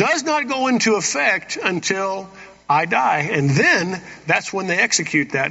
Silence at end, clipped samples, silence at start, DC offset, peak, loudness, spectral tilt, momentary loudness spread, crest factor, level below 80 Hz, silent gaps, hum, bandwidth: 0 s; under 0.1%; 0 s; under 0.1%; -2 dBFS; -18 LUFS; -3 dB/octave; 7 LU; 18 dB; -60 dBFS; none; none; 8 kHz